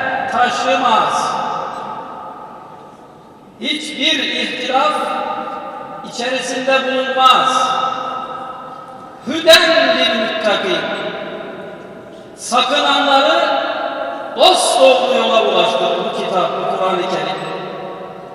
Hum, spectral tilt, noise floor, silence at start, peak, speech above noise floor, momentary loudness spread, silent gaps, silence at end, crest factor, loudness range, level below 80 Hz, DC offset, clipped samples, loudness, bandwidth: none; -2 dB/octave; -40 dBFS; 0 s; 0 dBFS; 26 dB; 19 LU; none; 0 s; 16 dB; 6 LU; -60 dBFS; under 0.1%; under 0.1%; -14 LUFS; 14.5 kHz